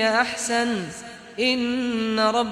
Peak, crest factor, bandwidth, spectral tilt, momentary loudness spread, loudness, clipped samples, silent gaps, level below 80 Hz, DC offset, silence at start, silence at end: -6 dBFS; 18 dB; 14.5 kHz; -3 dB/octave; 13 LU; -23 LUFS; under 0.1%; none; -58 dBFS; under 0.1%; 0 s; 0 s